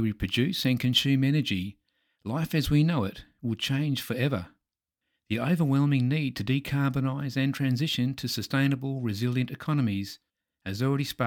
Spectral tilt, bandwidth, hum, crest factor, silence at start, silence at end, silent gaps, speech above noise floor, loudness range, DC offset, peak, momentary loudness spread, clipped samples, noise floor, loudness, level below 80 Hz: -6 dB/octave; 18.5 kHz; none; 18 dB; 0 s; 0 s; none; 59 dB; 2 LU; under 0.1%; -10 dBFS; 10 LU; under 0.1%; -86 dBFS; -27 LUFS; -52 dBFS